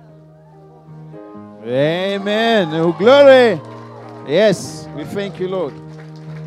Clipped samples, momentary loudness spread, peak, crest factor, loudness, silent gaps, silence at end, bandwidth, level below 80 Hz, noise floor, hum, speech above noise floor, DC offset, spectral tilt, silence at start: under 0.1%; 26 LU; 0 dBFS; 16 dB; -14 LUFS; none; 0 s; 12.5 kHz; -60 dBFS; -43 dBFS; none; 29 dB; under 0.1%; -5.5 dB/octave; 0.9 s